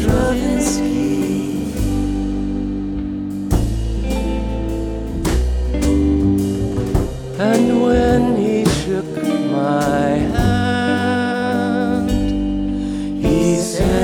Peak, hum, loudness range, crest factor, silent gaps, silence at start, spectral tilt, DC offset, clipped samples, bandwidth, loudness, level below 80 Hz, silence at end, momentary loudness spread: -2 dBFS; none; 5 LU; 14 dB; none; 0 s; -6 dB/octave; under 0.1%; under 0.1%; 18.5 kHz; -18 LUFS; -26 dBFS; 0 s; 7 LU